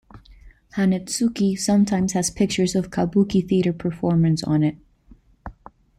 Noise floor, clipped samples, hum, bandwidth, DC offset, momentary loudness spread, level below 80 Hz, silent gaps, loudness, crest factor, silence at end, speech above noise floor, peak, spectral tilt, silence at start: -52 dBFS; under 0.1%; none; 15 kHz; under 0.1%; 9 LU; -48 dBFS; none; -21 LUFS; 14 dB; 0.5 s; 32 dB; -8 dBFS; -6 dB/octave; 0.15 s